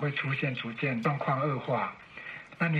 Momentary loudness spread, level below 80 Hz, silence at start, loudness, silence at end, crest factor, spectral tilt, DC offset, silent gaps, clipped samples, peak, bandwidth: 13 LU; -70 dBFS; 0 s; -31 LUFS; 0 s; 18 dB; -8 dB/octave; under 0.1%; none; under 0.1%; -14 dBFS; 7.2 kHz